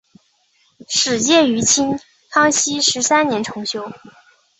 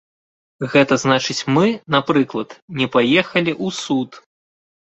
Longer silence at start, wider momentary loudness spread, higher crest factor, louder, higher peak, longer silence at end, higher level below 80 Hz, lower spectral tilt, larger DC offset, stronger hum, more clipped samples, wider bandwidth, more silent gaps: first, 0.9 s vs 0.6 s; about the same, 11 LU vs 10 LU; about the same, 18 dB vs 18 dB; about the same, -16 LUFS vs -18 LUFS; about the same, -2 dBFS vs -2 dBFS; about the same, 0.65 s vs 0.7 s; about the same, -56 dBFS vs -58 dBFS; second, -1.5 dB/octave vs -5 dB/octave; neither; neither; neither; about the same, 8.4 kHz vs 8.2 kHz; second, none vs 2.62-2.68 s